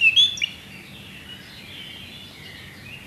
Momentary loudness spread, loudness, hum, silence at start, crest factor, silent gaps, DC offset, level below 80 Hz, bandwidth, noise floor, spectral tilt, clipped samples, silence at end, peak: 22 LU; -18 LUFS; none; 0 s; 20 dB; none; under 0.1%; -56 dBFS; 14 kHz; -41 dBFS; -0.5 dB/octave; under 0.1%; 0 s; -6 dBFS